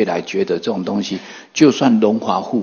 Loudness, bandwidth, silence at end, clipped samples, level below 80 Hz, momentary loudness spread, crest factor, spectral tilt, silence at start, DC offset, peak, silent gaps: -17 LUFS; 7 kHz; 0 s; under 0.1%; -64 dBFS; 12 LU; 16 dB; -5.5 dB/octave; 0 s; under 0.1%; 0 dBFS; none